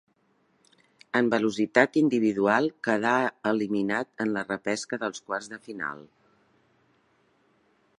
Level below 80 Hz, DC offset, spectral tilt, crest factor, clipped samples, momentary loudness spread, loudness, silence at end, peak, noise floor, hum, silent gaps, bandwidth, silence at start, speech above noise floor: -74 dBFS; under 0.1%; -5 dB/octave; 24 dB; under 0.1%; 12 LU; -26 LUFS; 1.95 s; -4 dBFS; -68 dBFS; none; none; 11 kHz; 1.15 s; 42 dB